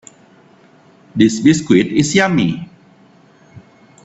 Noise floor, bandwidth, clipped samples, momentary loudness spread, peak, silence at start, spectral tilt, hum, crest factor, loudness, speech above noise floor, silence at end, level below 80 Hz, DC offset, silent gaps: -48 dBFS; 8.4 kHz; under 0.1%; 16 LU; 0 dBFS; 1.15 s; -5 dB/octave; none; 18 dB; -14 LUFS; 35 dB; 0.45 s; -52 dBFS; under 0.1%; none